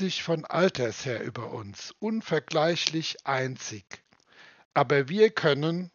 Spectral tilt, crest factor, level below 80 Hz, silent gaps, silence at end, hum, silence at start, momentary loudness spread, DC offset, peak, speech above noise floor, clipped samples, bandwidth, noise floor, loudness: -3.5 dB/octave; 26 dB; -72 dBFS; 4.65-4.71 s; 0.05 s; none; 0 s; 15 LU; under 0.1%; -2 dBFS; 29 dB; under 0.1%; 7.2 kHz; -56 dBFS; -27 LUFS